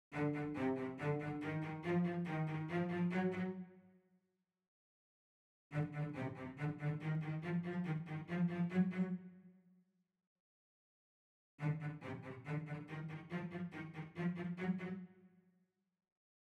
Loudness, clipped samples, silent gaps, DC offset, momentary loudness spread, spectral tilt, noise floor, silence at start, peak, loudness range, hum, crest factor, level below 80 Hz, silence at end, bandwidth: -42 LUFS; under 0.1%; 4.68-5.70 s, 10.27-11.58 s; under 0.1%; 10 LU; -9 dB/octave; -86 dBFS; 0.1 s; -24 dBFS; 7 LU; none; 18 dB; -76 dBFS; 1.15 s; 7.6 kHz